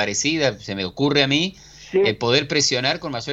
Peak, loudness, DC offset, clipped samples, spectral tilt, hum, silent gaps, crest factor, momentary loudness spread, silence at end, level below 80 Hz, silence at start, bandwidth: -2 dBFS; -20 LUFS; under 0.1%; under 0.1%; -3.5 dB/octave; none; none; 18 dB; 9 LU; 0 s; -52 dBFS; 0 s; 8.2 kHz